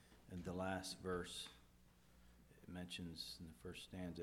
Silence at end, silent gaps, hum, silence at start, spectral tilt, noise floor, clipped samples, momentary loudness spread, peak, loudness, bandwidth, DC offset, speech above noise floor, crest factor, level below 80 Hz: 0 s; none; 60 Hz at -70 dBFS; 0 s; -4.5 dB/octave; -69 dBFS; under 0.1%; 21 LU; -32 dBFS; -50 LUFS; 18 kHz; under 0.1%; 20 dB; 20 dB; -68 dBFS